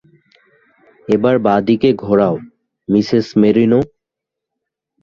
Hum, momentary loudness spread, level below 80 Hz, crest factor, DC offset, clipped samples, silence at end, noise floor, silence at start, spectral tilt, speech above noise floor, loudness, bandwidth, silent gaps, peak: none; 13 LU; -52 dBFS; 14 dB; under 0.1%; under 0.1%; 1.15 s; -82 dBFS; 1.1 s; -8 dB/octave; 69 dB; -14 LUFS; 7.2 kHz; none; -2 dBFS